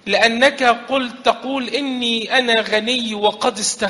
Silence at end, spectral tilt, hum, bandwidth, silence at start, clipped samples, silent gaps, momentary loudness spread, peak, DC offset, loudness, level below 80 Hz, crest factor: 0 s; -2 dB/octave; none; 11.5 kHz; 0.05 s; under 0.1%; none; 8 LU; 0 dBFS; under 0.1%; -17 LUFS; -58 dBFS; 18 dB